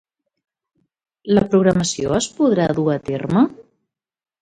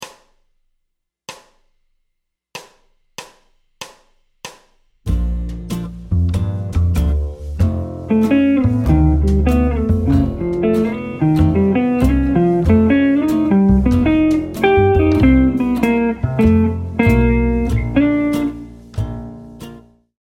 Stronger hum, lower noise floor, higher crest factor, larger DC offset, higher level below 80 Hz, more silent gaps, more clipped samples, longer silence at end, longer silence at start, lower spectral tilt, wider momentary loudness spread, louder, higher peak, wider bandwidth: neither; about the same, -75 dBFS vs -73 dBFS; about the same, 18 dB vs 16 dB; neither; second, -48 dBFS vs -24 dBFS; neither; neither; first, 0.8 s vs 0.5 s; first, 1.25 s vs 0 s; second, -5.5 dB/octave vs -8.5 dB/octave; second, 5 LU vs 23 LU; about the same, -18 LUFS vs -16 LUFS; about the same, -2 dBFS vs 0 dBFS; second, 9.6 kHz vs 16 kHz